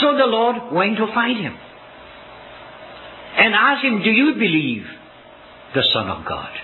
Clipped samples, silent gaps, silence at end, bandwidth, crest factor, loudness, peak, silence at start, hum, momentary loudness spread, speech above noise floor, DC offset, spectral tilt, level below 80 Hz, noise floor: under 0.1%; none; 0 s; 4.3 kHz; 20 dB; -17 LUFS; 0 dBFS; 0 s; none; 24 LU; 25 dB; under 0.1%; -7.5 dB/octave; -56 dBFS; -43 dBFS